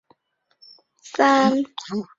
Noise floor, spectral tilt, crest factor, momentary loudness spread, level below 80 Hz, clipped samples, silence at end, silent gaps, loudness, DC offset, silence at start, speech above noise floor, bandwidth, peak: -70 dBFS; -4.5 dB/octave; 20 dB; 14 LU; -68 dBFS; under 0.1%; 0.15 s; none; -20 LUFS; under 0.1%; 1.05 s; 50 dB; 7.8 kHz; -4 dBFS